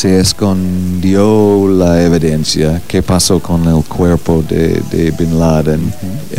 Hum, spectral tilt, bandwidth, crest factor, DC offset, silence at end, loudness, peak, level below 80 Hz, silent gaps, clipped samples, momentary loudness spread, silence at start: none; -6 dB/octave; 16.5 kHz; 12 dB; 6%; 0 s; -11 LUFS; 0 dBFS; -28 dBFS; none; under 0.1%; 5 LU; 0 s